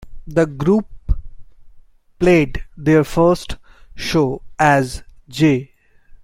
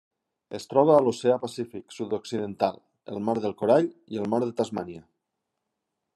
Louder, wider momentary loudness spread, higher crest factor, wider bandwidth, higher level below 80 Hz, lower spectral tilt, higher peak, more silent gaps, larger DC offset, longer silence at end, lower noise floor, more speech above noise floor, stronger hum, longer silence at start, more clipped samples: first, -17 LUFS vs -26 LUFS; second, 13 LU vs 19 LU; about the same, 16 dB vs 20 dB; first, 16 kHz vs 12 kHz; first, -32 dBFS vs -74 dBFS; about the same, -6.5 dB/octave vs -6.5 dB/octave; first, -2 dBFS vs -6 dBFS; neither; neither; second, 0.6 s vs 1.15 s; second, -45 dBFS vs -82 dBFS; second, 29 dB vs 57 dB; neither; second, 0 s vs 0.5 s; neither